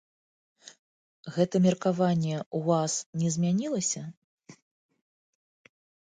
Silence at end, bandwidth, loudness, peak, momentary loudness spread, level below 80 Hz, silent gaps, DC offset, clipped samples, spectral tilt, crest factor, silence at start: 1.6 s; 9.6 kHz; -28 LUFS; -10 dBFS; 11 LU; -72 dBFS; 2.46-2.51 s, 3.06-3.13 s, 4.17-4.38 s; under 0.1%; under 0.1%; -5.5 dB/octave; 20 dB; 1.25 s